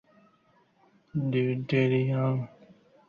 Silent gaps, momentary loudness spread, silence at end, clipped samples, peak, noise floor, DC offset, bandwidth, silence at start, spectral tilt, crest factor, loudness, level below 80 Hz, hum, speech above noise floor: none; 10 LU; 0.6 s; under 0.1%; -14 dBFS; -65 dBFS; under 0.1%; 6.6 kHz; 1.15 s; -9.5 dB/octave; 16 dB; -28 LUFS; -66 dBFS; none; 39 dB